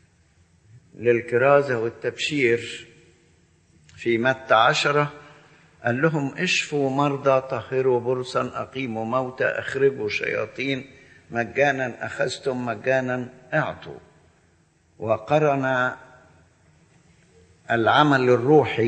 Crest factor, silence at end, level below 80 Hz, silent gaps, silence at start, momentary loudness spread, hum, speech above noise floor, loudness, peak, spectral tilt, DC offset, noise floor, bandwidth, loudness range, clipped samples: 20 dB; 0 s; -64 dBFS; none; 0.75 s; 12 LU; none; 39 dB; -22 LUFS; -4 dBFS; -5.5 dB/octave; under 0.1%; -61 dBFS; 8.8 kHz; 5 LU; under 0.1%